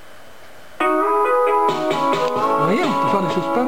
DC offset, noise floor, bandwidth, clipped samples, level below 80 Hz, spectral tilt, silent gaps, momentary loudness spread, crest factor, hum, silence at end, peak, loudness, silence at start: 1%; -44 dBFS; 17 kHz; under 0.1%; -64 dBFS; -5.5 dB/octave; none; 3 LU; 12 dB; none; 0 s; -8 dBFS; -18 LUFS; 0.4 s